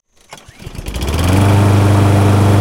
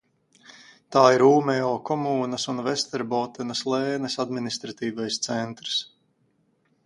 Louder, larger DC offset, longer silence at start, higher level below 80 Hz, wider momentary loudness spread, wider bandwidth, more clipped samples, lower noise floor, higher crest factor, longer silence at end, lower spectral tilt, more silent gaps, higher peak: first, -12 LUFS vs -24 LUFS; neither; second, 0.3 s vs 0.5 s; first, -28 dBFS vs -70 dBFS; first, 16 LU vs 11 LU; first, 16 kHz vs 11.5 kHz; neither; second, -39 dBFS vs -68 dBFS; second, 12 dB vs 24 dB; second, 0 s vs 1 s; first, -6.5 dB/octave vs -4.5 dB/octave; neither; about the same, 0 dBFS vs -2 dBFS